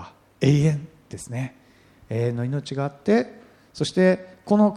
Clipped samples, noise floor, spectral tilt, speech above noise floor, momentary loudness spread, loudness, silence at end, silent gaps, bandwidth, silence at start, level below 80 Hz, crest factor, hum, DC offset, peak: under 0.1%; -54 dBFS; -7 dB/octave; 32 dB; 15 LU; -24 LUFS; 0 s; none; 11.5 kHz; 0 s; -56 dBFS; 18 dB; none; under 0.1%; -4 dBFS